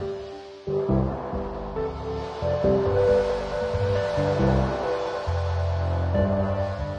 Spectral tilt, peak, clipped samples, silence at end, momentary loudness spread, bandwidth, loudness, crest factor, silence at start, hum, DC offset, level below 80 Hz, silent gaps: -8 dB/octave; -8 dBFS; under 0.1%; 0 s; 10 LU; 8.8 kHz; -25 LUFS; 16 dB; 0 s; none; under 0.1%; -38 dBFS; none